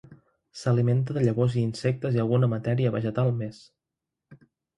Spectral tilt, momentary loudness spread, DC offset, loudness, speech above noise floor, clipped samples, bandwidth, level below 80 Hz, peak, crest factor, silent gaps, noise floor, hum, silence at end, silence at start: -8 dB/octave; 8 LU; under 0.1%; -26 LUFS; 62 dB; under 0.1%; 10.5 kHz; -58 dBFS; -10 dBFS; 16 dB; none; -87 dBFS; none; 0.4 s; 0.1 s